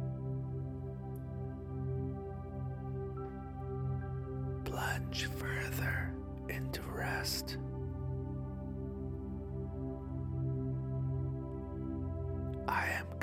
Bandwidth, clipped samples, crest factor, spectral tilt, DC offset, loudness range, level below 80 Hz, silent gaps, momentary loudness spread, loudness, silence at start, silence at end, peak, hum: 16 kHz; under 0.1%; 24 dB; -5.5 dB/octave; under 0.1%; 3 LU; -48 dBFS; none; 7 LU; -40 LUFS; 0 s; 0 s; -16 dBFS; none